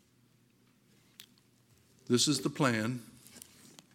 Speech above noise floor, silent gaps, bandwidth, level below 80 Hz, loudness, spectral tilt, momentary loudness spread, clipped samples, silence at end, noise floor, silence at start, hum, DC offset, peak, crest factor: 37 dB; none; 17 kHz; -78 dBFS; -31 LUFS; -4 dB/octave; 24 LU; under 0.1%; 0.55 s; -68 dBFS; 1.2 s; none; under 0.1%; -10 dBFS; 26 dB